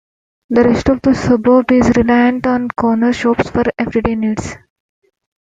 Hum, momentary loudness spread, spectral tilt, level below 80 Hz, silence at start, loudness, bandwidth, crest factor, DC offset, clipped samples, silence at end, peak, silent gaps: none; 6 LU; -6.5 dB/octave; -36 dBFS; 0.5 s; -14 LUFS; 7.8 kHz; 14 dB; under 0.1%; under 0.1%; 0.9 s; 0 dBFS; none